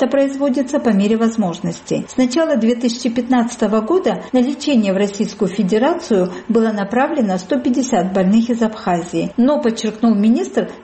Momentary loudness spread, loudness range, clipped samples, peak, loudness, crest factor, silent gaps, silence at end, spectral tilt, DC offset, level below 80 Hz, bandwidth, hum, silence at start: 5 LU; 1 LU; under 0.1%; -4 dBFS; -17 LUFS; 12 dB; none; 0 s; -6 dB/octave; under 0.1%; -54 dBFS; 8.8 kHz; none; 0 s